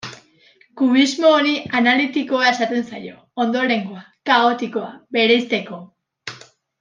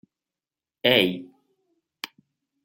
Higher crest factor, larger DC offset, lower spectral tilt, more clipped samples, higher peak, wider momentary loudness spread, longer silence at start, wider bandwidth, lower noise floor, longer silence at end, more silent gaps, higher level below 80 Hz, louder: second, 18 dB vs 26 dB; neither; about the same, -4 dB/octave vs -4.5 dB/octave; neither; about the same, -2 dBFS vs -2 dBFS; about the same, 20 LU vs 19 LU; second, 0.05 s vs 0.85 s; second, 9.6 kHz vs 16.5 kHz; second, -54 dBFS vs under -90 dBFS; second, 0.45 s vs 0.6 s; neither; about the same, -70 dBFS vs -68 dBFS; first, -18 LUFS vs -21 LUFS